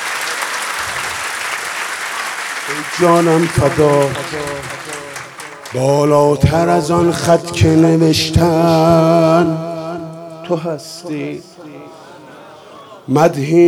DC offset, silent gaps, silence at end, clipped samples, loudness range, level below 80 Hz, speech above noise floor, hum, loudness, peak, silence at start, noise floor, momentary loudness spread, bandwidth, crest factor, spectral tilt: under 0.1%; none; 0 s; under 0.1%; 9 LU; -40 dBFS; 24 dB; none; -14 LUFS; 0 dBFS; 0 s; -37 dBFS; 16 LU; 16.5 kHz; 14 dB; -5.5 dB/octave